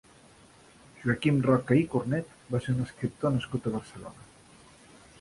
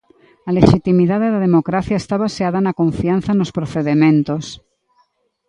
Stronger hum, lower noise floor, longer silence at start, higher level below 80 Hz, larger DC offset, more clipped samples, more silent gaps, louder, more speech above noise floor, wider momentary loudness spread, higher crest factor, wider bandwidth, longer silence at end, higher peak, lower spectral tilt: neither; second, -56 dBFS vs -61 dBFS; first, 1 s vs 0.45 s; second, -58 dBFS vs -40 dBFS; neither; neither; neither; second, -29 LUFS vs -16 LUFS; second, 28 dB vs 46 dB; first, 12 LU vs 8 LU; about the same, 20 dB vs 16 dB; first, 11.5 kHz vs 10 kHz; about the same, 0.95 s vs 0.95 s; second, -10 dBFS vs 0 dBFS; about the same, -7.5 dB/octave vs -7.5 dB/octave